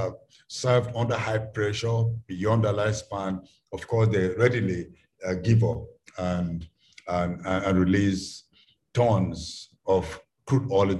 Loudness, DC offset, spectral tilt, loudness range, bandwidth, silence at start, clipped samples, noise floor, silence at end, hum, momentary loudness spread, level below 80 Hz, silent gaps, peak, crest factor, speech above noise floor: -26 LUFS; under 0.1%; -6.5 dB/octave; 2 LU; 11 kHz; 0 s; under 0.1%; -62 dBFS; 0 s; none; 15 LU; -46 dBFS; none; -8 dBFS; 18 dB; 37 dB